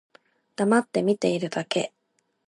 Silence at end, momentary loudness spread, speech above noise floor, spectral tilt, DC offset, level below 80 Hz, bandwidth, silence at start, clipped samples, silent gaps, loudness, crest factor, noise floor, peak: 0.6 s; 9 LU; 49 dB; -5 dB/octave; under 0.1%; -76 dBFS; 11.5 kHz; 0.6 s; under 0.1%; none; -25 LUFS; 18 dB; -73 dBFS; -8 dBFS